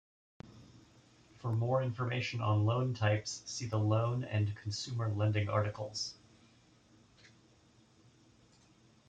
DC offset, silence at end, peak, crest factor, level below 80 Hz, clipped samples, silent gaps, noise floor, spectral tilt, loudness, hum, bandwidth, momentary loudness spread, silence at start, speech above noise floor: under 0.1%; 2.95 s; -18 dBFS; 18 dB; -68 dBFS; under 0.1%; none; -65 dBFS; -5.5 dB/octave; -35 LUFS; none; 8.8 kHz; 8 LU; 0.45 s; 32 dB